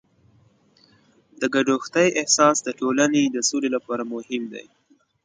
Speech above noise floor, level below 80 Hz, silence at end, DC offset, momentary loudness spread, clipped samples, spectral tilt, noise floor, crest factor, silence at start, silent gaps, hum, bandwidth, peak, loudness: 37 dB; -70 dBFS; 0.65 s; under 0.1%; 13 LU; under 0.1%; -3 dB/octave; -58 dBFS; 20 dB; 1.4 s; none; none; 9.6 kHz; -2 dBFS; -21 LUFS